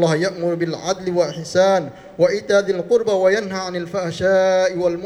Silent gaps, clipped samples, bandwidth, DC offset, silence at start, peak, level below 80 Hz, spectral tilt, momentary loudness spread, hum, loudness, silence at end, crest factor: none; under 0.1%; 11.5 kHz; under 0.1%; 0 s; -4 dBFS; -56 dBFS; -5 dB/octave; 8 LU; none; -19 LUFS; 0 s; 14 dB